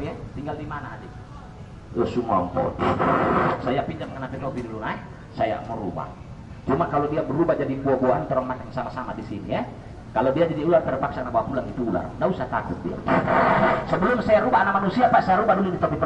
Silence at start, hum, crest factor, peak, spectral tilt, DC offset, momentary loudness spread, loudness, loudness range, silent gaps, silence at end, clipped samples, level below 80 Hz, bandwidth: 0 s; none; 18 dB; -6 dBFS; -8 dB/octave; under 0.1%; 15 LU; -23 LUFS; 6 LU; none; 0 s; under 0.1%; -46 dBFS; 8.6 kHz